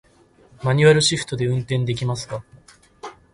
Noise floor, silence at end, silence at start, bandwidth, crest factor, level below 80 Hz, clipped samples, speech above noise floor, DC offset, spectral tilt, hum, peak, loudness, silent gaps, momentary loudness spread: -53 dBFS; 0.2 s; 0.6 s; 11.5 kHz; 20 dB; -52 dBFS; under 0.1%; 34 dB; under 0.1%; -5 dB/octave; none; -2 dBFS; -19 LUFS; none; 23 LU